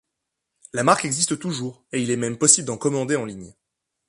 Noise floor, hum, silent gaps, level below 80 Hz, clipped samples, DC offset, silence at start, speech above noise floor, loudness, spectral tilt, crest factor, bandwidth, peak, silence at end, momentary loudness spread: -81 dBFS; none; none; -62 dBFS; under 0.1%; under 0.1%; 0.75 s; 59 dB; -21 LUFS; -3 dB/octave; 22 dB; 11.5 kHz; 0 dBFS; 0.6 s; 14 LU